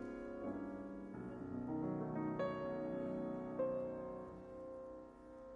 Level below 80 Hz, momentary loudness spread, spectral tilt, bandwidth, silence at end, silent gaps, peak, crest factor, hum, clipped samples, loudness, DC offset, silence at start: -68 dBFS; 11 LU; -9 dB/octave; 7.6 kHz; 0 s; none; -30 dBFS; 14 dB; none; under 0.1%; -45 LUFS; under 0.1%; 0 s